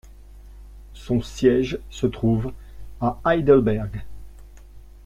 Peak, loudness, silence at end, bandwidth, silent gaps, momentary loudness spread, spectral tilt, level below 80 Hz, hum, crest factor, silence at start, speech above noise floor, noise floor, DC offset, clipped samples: -4 dBFS; -22 LUFS; 0.1 s; 13.5 kHz; none; 16 LU; -7.5 dB/octave; -40 dBFS; none; 20 dB; 0.05 s; 22 dB; -43 dBFS; under 0.1%; under 0.1%